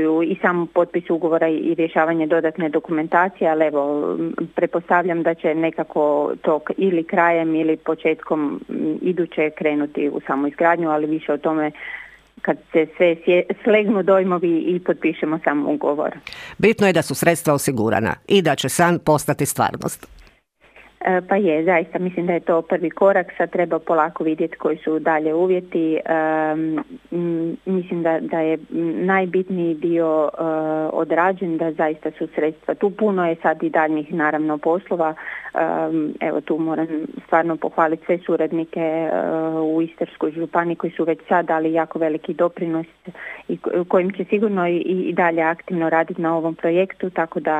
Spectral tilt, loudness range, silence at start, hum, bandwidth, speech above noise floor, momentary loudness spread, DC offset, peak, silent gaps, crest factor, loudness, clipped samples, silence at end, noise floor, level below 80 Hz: -6 dB/octave; 3 LU; 0 s; none; 15.5 kHz; 34 dB; 7 LU; under 0.1%; 0 dBFS; none; 20 dB; -20 LUFS; under 0.1%; 0 s; -54 dBFS; -60 dBFS